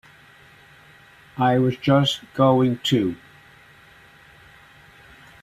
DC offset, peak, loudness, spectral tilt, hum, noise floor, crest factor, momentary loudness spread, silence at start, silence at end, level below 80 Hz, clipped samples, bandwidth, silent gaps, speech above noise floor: under 0.1%; -4 dBFS; -20 LUFS; -6.5 dB/octave; none; -50 dBFS; 20 dB; 10 LU; 1.35 s; 2.25 s; -60 dBFS; under 0.1%; 14 kHz; none; 31 dB